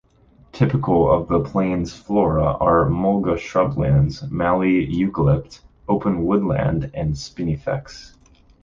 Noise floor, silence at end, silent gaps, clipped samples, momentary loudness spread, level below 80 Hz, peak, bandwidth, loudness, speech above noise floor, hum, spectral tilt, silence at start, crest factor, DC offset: -53 dBFS; 0.55 s; none; under 0.1%; 9 LU; -36 dBFS; -4 dBFS; 7.4 kHz; -20 LUFS; 34 dB; none; -8.5 dB/octave; 0.55 s; 16 dB; under 0.1%